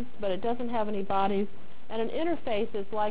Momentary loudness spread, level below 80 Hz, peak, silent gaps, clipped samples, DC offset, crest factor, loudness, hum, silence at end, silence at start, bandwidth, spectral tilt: 6 LU; -58 dBFS; -16 dBFS; none; under 0.1%; 4%; 16 dB; -31 LUFS; none; 0 s; 0 s; 4 kHz; -9.5 dB/octave